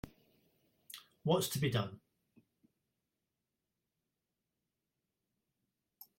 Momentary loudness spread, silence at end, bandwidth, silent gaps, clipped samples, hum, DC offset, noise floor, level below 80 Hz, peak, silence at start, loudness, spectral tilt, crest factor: 20 LU; 0.15 s; 16.5 kHz; none; under 0.1%; none; under 0.1%; -89 dBFS; -70 dBFS; -18 dBFS; 0.05 s; -36 LUFS; -5 dB/octave; 24 dB